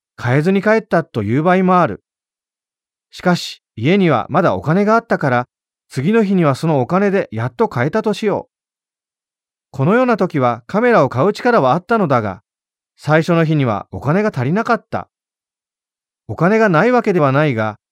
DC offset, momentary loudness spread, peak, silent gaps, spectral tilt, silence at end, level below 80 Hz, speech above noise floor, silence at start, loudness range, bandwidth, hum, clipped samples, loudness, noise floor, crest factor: under 0.1%; 8 LU; -2 dBFS; none; -7.5 dB/octave; 0.15 s; -56 dBFS; over 75 dB; 0.2 s; 3 LU; 13 kHz; none; under 0.1%; -15 LUFS; under -90 dBFS; 14 dB